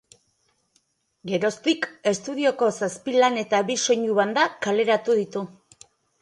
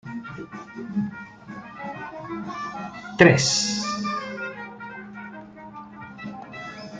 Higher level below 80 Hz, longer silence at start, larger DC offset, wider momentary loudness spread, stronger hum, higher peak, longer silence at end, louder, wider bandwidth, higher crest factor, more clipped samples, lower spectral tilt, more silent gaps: second, -72 dBFS vs -60 dBFS; first, 1.25 s vs 0.05 s; neither; second, 8 LU vs 23 LU; neither; about the same, -4 dBFS vs -2 dBFS; first, 0.75 s vs 0 s; about the same, -23 LUFS vs -24 LUFS; first, 11.5 kHz vs 9.6 kHz; second, 20 dB vs 26 dB; neither; about the same, -3.5 dB/octave vs -4 dB/octave; neither